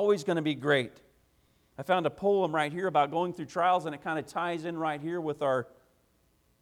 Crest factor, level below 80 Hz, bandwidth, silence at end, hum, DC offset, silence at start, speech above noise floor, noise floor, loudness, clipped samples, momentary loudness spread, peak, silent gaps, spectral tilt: 18 dB; -70 dBFS; 14.5 kHz; 0.95 s; none; under 0.1%; 0 s; 40 dB; -69 dBFS; -30 LUFS; under 0.1%; 7 LU; -12 dBFS; none; -6 dB/octave